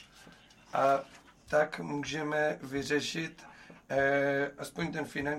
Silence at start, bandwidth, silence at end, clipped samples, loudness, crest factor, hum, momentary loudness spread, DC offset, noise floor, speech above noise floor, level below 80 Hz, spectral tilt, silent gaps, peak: 0 s; 15.5 kHz; 0 s; under 0.1%; -32 LUFS; 16 dB; none; 9 LU; under 0.1%; -57 dBFS; 25 dB; -64 dBFS; -4.5 dB/octave; none; -16 dBFS